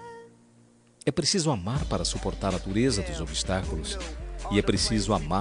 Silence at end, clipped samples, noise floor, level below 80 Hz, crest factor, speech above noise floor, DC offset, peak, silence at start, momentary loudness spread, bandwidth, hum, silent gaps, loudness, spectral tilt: 0 s; under 0.1%; -58 dBFS; -38 dBFS; 20 dB; 31 dB; under 0.1%; -8 dBFS; 0 s; 10 LU; 10.5 kHz; none; none; -28 LUFS; -4.5 dB/octave